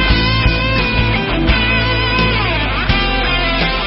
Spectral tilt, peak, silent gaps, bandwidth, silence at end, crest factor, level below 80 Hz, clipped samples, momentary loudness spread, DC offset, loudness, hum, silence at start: -9.5 dB/octave; 0 dBFS; none; 5.8 kHz; 0 s; 14 dB; -20 dBFS; under 0.1%; 2 LU; under 0.1%; -14 LUFS; none; 0 s